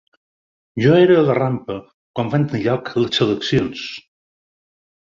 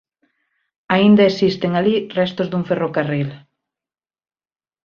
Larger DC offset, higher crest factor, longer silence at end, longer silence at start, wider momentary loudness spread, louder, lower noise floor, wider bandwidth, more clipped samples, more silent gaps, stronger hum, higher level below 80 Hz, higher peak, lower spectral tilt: neither; about the same, 18 dB vs 18 dB; second, 1.15 s vs 1.5 s; second, 0.75 s vs 0.9 s; first, 18 LU vs 10 LU; about the same, -17 LUFS vs -17 LUFS; about the same, under -90 dBFS vs under -90 dBFS; about the same, 7.4 kHz vs 6.8 kHz; neither; first, 1.94-2.14 s vs none; neither; first, -52 dBFS vs -58 dBFS; about the same, -2 dBFS vs -2 dBFS; about the same, -7 dB/octave vs -7.5 dB/octave